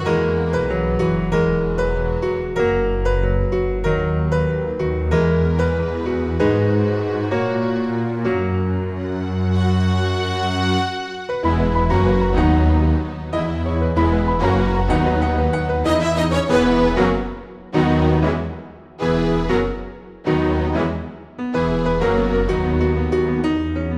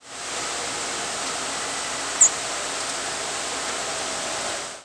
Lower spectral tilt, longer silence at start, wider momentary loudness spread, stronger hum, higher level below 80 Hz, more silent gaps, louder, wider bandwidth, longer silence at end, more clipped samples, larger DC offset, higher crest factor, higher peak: first, -7.5 dB/octave vs 0.5 dB/octave; about the same, 0 s vs 0 s; second, 7 LU vs 10 LU; neither; first, -26 dBFS vs -58 dBFS; neither; first, -19 LUFS vs -24 LUFS; about the same, 10 kHz vs 11 kHz; about the same, 0 s vs 0 s; neither; first, 0.4% vs under 0.1%; second, 16 dB vs 24 dB; about the same, -4 dBFS vs -2 dBFS